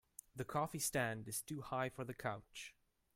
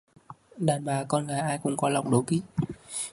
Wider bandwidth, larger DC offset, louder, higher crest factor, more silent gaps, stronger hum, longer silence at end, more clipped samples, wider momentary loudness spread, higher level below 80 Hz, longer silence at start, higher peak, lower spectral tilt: first, 16.5 kHz vs 11.5 kHz; neither; second, -43 LUFS vs -28 LUFS; about the same, 20 dB vs 20 dB; neither; neither; first, 0.45 s vs 0 s; neither; first, 14 LU vs 7 LU; second, -70 dBFS vs -60 dBFS; about the same, 0.35 s vs 0.3 s; second, -24 dBFS vs -8 dBFS; second, -4 dB/octave vs -5.5 dB/octave